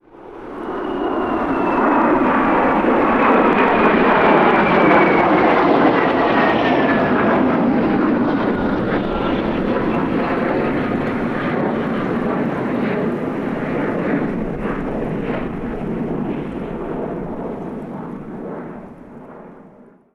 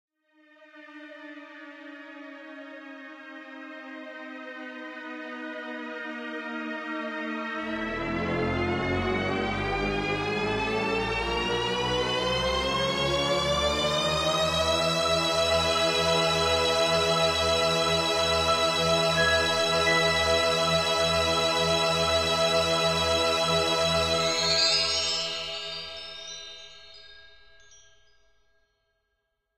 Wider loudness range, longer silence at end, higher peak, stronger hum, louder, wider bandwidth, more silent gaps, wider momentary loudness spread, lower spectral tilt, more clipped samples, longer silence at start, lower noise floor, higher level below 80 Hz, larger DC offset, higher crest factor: second, 12 LU vs 18 LU; second, 0.45 s vs 2.35 s; first, -2 dBFS vs -10 dBFS; neither; first, -17 LUFS vs -25 LUFS; second, 6.8 kHz vs 16 kHz; neither; second, 14 LU vs 20 LU; first, -8 dB/octave vs -3 dB/octave; neither; second, 0.15 s vs 0.6 s; second, -45 dBFS vs -78 dBFS; first, -40 dBFS vs -46 dBFS; neither; about the same, 16 dB vs 16 dB